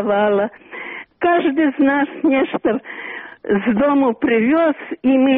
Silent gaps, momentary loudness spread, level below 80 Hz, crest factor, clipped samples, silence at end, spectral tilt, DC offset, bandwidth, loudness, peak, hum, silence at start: none; 14 LU; -54 dBFS; 12 dB; under 0.1%; 0 s; -4.5 dB/octave; under 0.1%; 3.9 kHz; -17 LUFS; -4 dBFS; none; 0 s